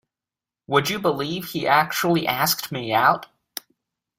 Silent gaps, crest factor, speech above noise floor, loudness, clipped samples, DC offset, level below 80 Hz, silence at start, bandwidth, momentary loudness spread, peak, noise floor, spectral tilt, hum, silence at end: none; 20 dB; 69 dB; -21 LUFS; under 0.1%; under 0.1%; -62 dBFS; 0.7 s; 16 kHz; 16 LU; -4 dBFS; -90 dBFS; -4 dB/octave; none; 0.95 s